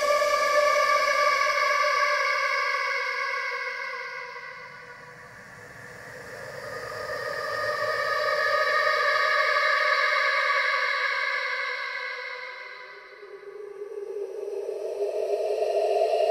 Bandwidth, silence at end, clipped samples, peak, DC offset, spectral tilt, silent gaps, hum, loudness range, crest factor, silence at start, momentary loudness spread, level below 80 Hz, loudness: 16 kHz; 0 s; under 0.1%; -10 dBFS; under 0.1%; -1 dB/octave; none; none; 13 LU; 18 dB; 0 s; 20 LU; -68 dBFS; -25 LUFS